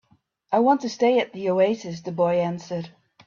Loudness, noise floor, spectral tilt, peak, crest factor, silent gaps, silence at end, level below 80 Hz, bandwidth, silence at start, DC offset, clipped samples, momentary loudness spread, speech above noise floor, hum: -23 LUFS; -63 dBFS; -6 dB/octave; -8 dBFS; 16 dB; none; 0.35 s; -68 dBFS; 7.4 kHz; 0.5 s; under 0.1%; under 0.1%; 12 LU; 41 dB; none